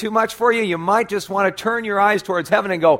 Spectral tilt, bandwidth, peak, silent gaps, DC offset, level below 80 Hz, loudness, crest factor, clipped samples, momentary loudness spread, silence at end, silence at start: -5 dB/octave; 16.5 kHz; -2 dBFS; none; under 0.1%; -60 dBFS; -18 LUFS; 16 dB; under 0.1%; 3 LU; 0 s; 0 s